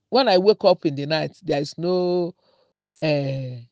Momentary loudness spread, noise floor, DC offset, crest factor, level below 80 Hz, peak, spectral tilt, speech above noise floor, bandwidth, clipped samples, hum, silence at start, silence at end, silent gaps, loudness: 11 LU; -64 dBFS; under 0.1%; 18 dB; -66 dBFS; -4 dBFS; -6.5 dB/octave; 44 dB; 8.2 kHz; under 0.1%; none; 0.1 s; 0.1 s; none; -22 LUFS